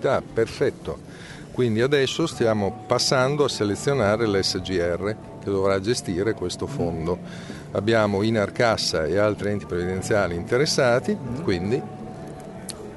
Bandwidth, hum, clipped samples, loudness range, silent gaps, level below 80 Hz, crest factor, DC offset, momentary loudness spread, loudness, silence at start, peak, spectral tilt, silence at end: 11.5 kHz; none; under 0.1%; 3 LU; none; -50 dBFS; 18 dB; under 0.1%; 15 LU; -23 LUFS; 0 s; -4 dBFS; -5 dB/octave; 0 s